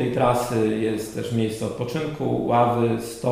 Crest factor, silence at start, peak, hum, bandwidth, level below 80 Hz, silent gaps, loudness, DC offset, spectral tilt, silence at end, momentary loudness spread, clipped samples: 16 dB; 0 s; -6 dBFS; none; 15.5 kHz; -50 dBFS; none; -23 LUFS; under 0.1%; -6.5 dB/octave; 0 s; 7 LU; under 0.1%